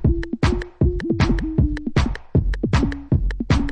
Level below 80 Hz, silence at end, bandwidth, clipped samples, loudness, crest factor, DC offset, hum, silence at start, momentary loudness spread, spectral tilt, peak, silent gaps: -24 dBFS; 0 s; 9.6 kHz; under 0.1%; -22 LUFS; 16 dB; under 0.1%; none; 0 s; 2 LU; -7.5 dB/octave; -4 dBFS; none